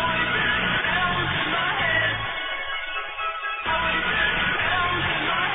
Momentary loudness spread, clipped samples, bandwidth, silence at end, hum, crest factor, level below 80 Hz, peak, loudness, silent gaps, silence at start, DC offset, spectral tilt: 7 LU; under 0.1%; 4 kHz; 0 s; none; 14 dB; -44 dBFS; -10 dBFS; -23 LUFS; none; 0 s; under 0.1%; -7 dB/octave